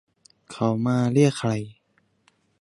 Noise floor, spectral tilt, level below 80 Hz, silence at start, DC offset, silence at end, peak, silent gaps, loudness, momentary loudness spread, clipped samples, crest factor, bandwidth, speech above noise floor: -67 dBFS; -7 dB/octave; -62 dBFS; 0.5 s; under 0.1%; 0.9 s; -6 dBFS; none; -23 LUFS; 17 LU; under 0.1%; 18 dB; 11.5 kHz; 46 dB